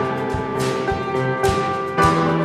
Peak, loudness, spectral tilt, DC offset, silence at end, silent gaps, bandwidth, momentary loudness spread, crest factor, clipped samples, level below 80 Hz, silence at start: -4 dBFS; -20 LUFS; -6 dB/octave; under 0.1%; 0 s; none; 15.5 kHz; 6 LU; 16 dB; under 0.1%; -38 dBFS; 0 s